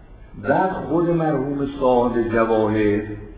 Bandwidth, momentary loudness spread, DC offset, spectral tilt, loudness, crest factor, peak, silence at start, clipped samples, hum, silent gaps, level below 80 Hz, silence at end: 4 kHz; 5 LU; under 0.1%; -11.5 dB/octave; -20 LUFS; 16 dB; -4 dBFS; 0 s; under 0.1%; none; none; -42 dBFS; 0 s